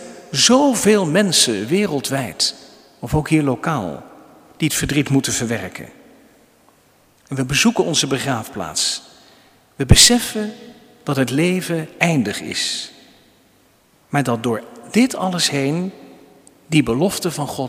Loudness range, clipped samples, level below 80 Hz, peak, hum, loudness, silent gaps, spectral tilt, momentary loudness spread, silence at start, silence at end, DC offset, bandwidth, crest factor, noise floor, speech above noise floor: 6 LU; under 0.1%; -38 dBFS; 0 dBFS; none; -17 LUFS; none; -3.5 dB/octave; 13 LU; 0 s; 0 s; under 0.1%; 16 kHz; 20 dB; -55 dBFS; 38 dB